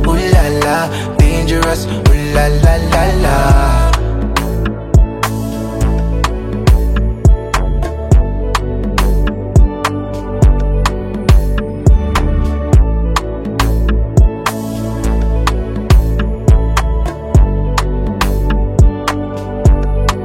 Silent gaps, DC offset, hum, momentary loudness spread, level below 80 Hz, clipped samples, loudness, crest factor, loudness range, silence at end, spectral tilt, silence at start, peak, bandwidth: none; under 0.1%; none; 6 LU; -14 dBFS; under 0.1%; -14 LUFS; 12 dB; 2 LU; 0 s; -6 dB/octave; 0 s; 0 dBFS; 15.5 kHz